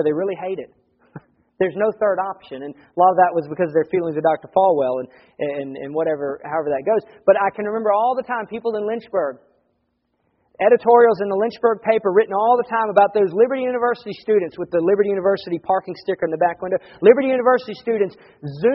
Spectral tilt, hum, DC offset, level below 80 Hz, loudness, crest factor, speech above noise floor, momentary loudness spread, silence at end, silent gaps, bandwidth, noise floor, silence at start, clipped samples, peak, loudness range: -5 dB/octave; none; under 0.1%; -64 dBFS; -19 LUFS; 20 dB; 51 dB; 12 LU; 0 s; none; 5.8 kHz; -70 dBFS; 0 s; under 0.1%; 0 dBFS; 4 LU